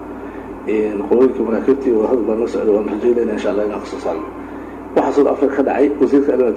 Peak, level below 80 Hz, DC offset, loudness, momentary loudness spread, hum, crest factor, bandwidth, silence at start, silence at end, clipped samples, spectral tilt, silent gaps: -2 dBFS; -46 dBFS; under 0.1%; -16 LUFS; 15 LU; none; 14 dB; 9 kHz; 0 s; 0 s; under 0.1%; -7 dB/octave; none